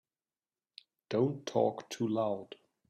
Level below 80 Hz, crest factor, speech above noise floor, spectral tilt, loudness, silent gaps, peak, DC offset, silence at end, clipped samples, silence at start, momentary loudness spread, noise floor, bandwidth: -78 dBFS; 20 dB; over 57 dB; -6.5 dB/octave; -34 LUFS; none; -14 dBFS; under 0.1%; 0.35 s; under 0.1%; 1.1 s; 7 LU; under -90 dBFS; 13 kHz